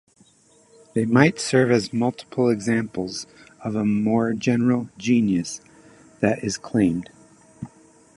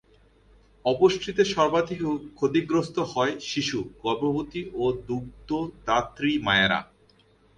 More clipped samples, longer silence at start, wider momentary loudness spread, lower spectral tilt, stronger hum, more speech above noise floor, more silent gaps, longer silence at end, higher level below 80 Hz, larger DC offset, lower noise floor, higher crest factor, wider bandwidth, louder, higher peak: neither; about the same, 0.95 s vs 0.85 s; first, 17 LU vs 9 LU; about the same, -6 dB/octave vs -5 dB/octave; neither; about the same, 36 dB vs 35 dB; neither; second, 0.5 s vs 0.75 s; about the same, -56 dBFS vs -54 dBFS; neither; about the same, -57 dBFS vs -60 dBFS; about the same, 22 dB vs 20 dB; first, 11.5 kHz vs 9.8 kHz; first, -22 LUFS vs -26 LUFS; first, 0 dBFS vs -6 dBFS